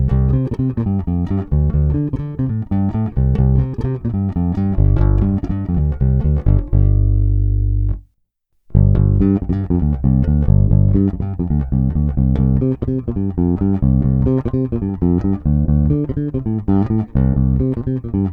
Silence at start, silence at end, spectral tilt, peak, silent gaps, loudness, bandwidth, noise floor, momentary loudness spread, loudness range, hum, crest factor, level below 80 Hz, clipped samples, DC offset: 0 s; 0 s; -12.5 dB/octave; 0 dBFS; none; -17 LUFS; 3.2 kHz; -65 dBFS; 6 LU; 2 LU; 50 Hz at -30 dBFS; 16 dB; -20 dBFS; under 0.1%; under 0.1%